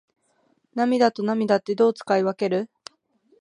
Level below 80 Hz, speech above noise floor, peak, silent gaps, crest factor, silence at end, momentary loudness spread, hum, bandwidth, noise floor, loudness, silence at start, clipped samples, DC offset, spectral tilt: -76 dBFS; 45 dB; -6 dBFS; none; 18 dB; 0.75 s; 7 LU; none; 10.5 kHz; -66 dBFS; -22 LUFS; 0.75 s; under 0.1%; under 0.1%; -6 dB/octave